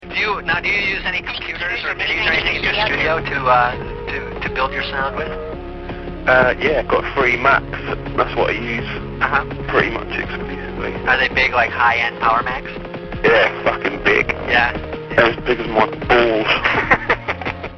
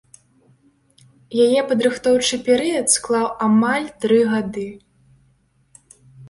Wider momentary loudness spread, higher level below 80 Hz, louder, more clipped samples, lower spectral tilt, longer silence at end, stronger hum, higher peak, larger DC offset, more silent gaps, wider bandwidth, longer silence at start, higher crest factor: first, 11 LU vs 8 LU; first, -34 dBFS vs -58 dBFS; about the same, -17 LUFS vs -18 LUFS; neither; first, -5.5 dB/octave vs -3.5 dB/octave; about the same, 0 s vs 0 s; neither; about the same, 0 dBFS vs -2 dBFS; neither; neither; second, 6.6 kHz vs 11.5 kHz; second, 0 s vs 1.3 s; about the same, 18 dB vs 20 dB